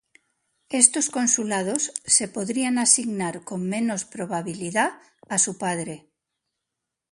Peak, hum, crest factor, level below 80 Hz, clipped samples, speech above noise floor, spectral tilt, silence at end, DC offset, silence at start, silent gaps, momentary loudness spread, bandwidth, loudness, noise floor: 0 dBFS; none; 26 dB; -70 dBFS; under 0.1%; 60 dB; -2.5 dB/octave; 1.15 s; under 0.1%; 0.7 s; none; 13 LU; 11.5 kHz; -22 LUFS; -84 dBFS